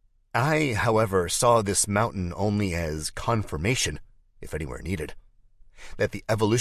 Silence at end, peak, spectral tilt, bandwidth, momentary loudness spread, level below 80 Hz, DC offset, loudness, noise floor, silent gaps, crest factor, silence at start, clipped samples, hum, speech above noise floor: 0 s; -8 dBFS; -4.5 dB/octave; 14 kHz; 12 LU; -42 dBFS; under 0.1%; -25 LUFS; -53 dBFS; none; 18 dB; 0.35 s; under 0.1%; none; 28 dB